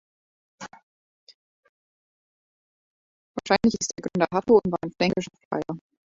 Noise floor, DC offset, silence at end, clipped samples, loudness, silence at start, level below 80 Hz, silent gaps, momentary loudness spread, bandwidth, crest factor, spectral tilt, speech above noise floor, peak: under -90 dBFS; under 0.1%; 0.35 s; under 0.1%; -24 LUFS; 0.6 s; -58 dBFS; 0.83-1.27 s, 1.34-1.63 s, 1.69-3.34 s, 5.45-5.51 s; 23 LU; 7.8 kHz; 22 dB; -5 dB/octave; over 66 dB; -4 dBFS